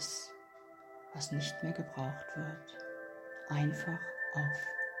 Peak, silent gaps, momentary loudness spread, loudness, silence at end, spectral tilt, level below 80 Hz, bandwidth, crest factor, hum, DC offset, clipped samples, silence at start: -22 dBFS; none; 16 LU; -39 LUFS; 0 s; -4.5 dB/octave; -76 dBFS; 16 kHz; 18 dB; none; under 0.1%; under 0.1%; 0 s